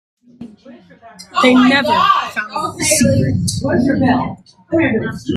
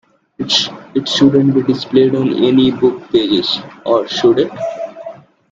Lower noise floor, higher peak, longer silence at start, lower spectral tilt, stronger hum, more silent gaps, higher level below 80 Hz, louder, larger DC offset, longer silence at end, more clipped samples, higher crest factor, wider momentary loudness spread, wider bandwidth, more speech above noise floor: first, -37 dBFS vs -33 dBFS; about the same, 0 dBFS vs 0 dBFS; about the same, 0.4 s vs 0.4 s; about the same, -4.5 dB/octave vs -5.5 dB/octave; neither; neither; first, -42 dBFS vs -54 dBFS; about the same, -14 LUFS vs -14 LUFS; neither; second, 0 s vs 0.4 s; neither; about the same, 16 dB vs 14 dB; about the same, 10 LU vs 12 LU; first, 15 kHz vs 7.8 kHz; about the same, 22 dB vs 20 dB